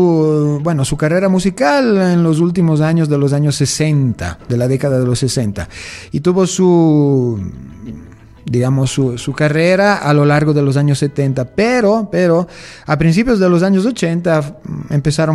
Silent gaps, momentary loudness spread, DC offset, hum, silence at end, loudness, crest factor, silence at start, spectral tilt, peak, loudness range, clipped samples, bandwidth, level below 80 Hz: none; 12 LU; under 0.1%; none; 0 s; -14 LUFS; 12 dB; 0 s; -6.5 dB/octave; 0 dBFS; 2 LU; under 0.1%; 12.5 kHz; -40 dBFS